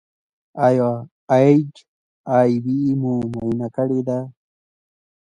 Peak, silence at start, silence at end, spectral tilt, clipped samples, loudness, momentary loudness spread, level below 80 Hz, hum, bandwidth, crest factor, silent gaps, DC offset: -2 dBFS; 0.55 s; 0.9 s; -9 dB/octave; under 0.1%; -19 LUFS; 15 LU; -58 dBFS; none; 9.8 kHz; 18 dB; 1.11-1.28 s, 1.88-2.24 s; under 0.1%